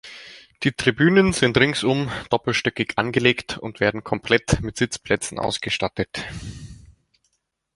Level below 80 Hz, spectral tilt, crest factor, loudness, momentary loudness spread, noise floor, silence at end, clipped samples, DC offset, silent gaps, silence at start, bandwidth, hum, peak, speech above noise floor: -44 dBFS; -4.5 dB/octave; 22 dB; -21 LUFS; 15 LU; -72 dBFS; 1 s; under 0.1%; under 0.1%; none; 0.05 s; 11.5 kHz; none; -2 dBFS; 51 dB